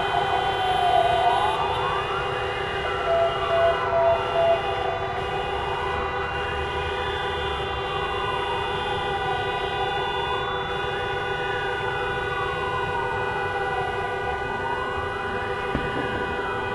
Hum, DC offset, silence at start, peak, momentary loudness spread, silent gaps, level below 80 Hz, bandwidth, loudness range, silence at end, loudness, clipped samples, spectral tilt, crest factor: none; under 0.1%; 0 s; -8 dBFS; 6 LU; none; -42 dBFS; 12.5 kHz; 4 LU; 0 s; -25 LUFS; under 0.1%; -5 dB/octave; 16 dB